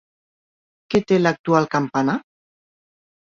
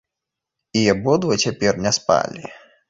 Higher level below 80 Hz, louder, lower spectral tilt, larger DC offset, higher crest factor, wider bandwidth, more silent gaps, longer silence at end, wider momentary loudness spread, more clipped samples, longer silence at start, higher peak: second, -58 dBFS vs -52 dBFS; about the same, -20 LUFS vs -19 LUFS; first, -6.5 dB/octave vs -4 dB/octave; neither; about the same, 20 dB vs 18 dB; about the same, 7.6 kHz vs 8 kHz; first, 1.39-1.44 s vs none; first, 1.1 s vs 0.35 s; second, 5 LU vs 11 LU; neither; first, 0.9 s vs 0.75 s; about the same, -2 dBFS vs -2 dBFS